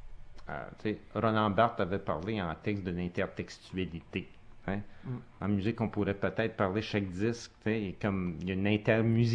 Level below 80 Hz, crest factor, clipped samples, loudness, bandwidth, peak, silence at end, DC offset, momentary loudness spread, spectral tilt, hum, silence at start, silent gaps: -54 dBFS; 20 dB; under 0.1%; -33 LUFS; 9.4 kHz; -12 dBFS; 0 s; under 0.1%; 14 LU; -7.5 dB/octave; none; 0 s; none